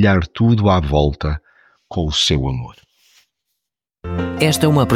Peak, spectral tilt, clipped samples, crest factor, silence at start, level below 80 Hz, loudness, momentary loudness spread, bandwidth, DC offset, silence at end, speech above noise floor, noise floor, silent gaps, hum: -2 dBFS; -5.5 dB/octave; under 0.1%; 16 dB; 0 s; -30 dBFS; -17 LUFS; 13 LU; 16 kHz; under 0.1%; 0 s; 65 dB; -80 dBFS; none; none